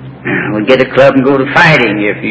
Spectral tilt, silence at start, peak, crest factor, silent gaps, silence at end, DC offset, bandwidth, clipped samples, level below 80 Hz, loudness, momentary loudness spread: -6.5 dB/octave; 0 s; 0 dBFS; 10 dB; none; 0 s; under 0.1%; 8 kHz; 3%; -42 dBFS; -8 LUFS; 8 LU